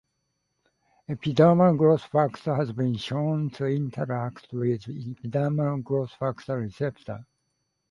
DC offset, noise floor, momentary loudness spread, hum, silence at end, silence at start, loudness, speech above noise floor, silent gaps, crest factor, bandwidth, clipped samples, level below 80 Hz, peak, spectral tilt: under 0.1%; -77 dBFS; 14 LU; none; 0.65 s; 1.1 s; -26 LUFS; 52 dB; none; 20 dB; 10.5 kHz; under 0.1%; -62 dBFS; -6 dBFS; -8.5 dB/octave